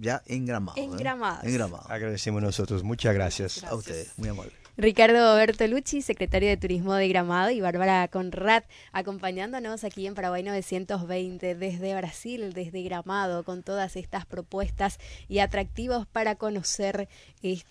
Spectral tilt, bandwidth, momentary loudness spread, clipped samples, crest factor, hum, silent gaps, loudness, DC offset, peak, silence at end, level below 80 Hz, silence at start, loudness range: -5 dB/octave; 11 kHz; 11 LU; under 0.1%; 22 dB; none; none; -27 LUFS; under 0.1%; -6 dBFS; 0.1 s; -44 dBFS; 0 s; 9 LU